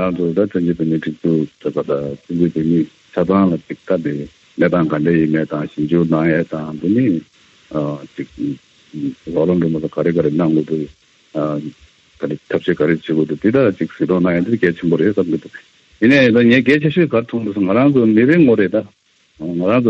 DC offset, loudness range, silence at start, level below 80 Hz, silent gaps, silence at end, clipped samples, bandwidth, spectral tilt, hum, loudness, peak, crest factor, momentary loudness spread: under 0.1%; 6 LU; 0 s; -52 dBFS; none; 0 s; under 0.1%; 7.6 kHz; -8.5 dB/octave; none; -16 LUFS; -2 dBFS; 14 dB; 13 LU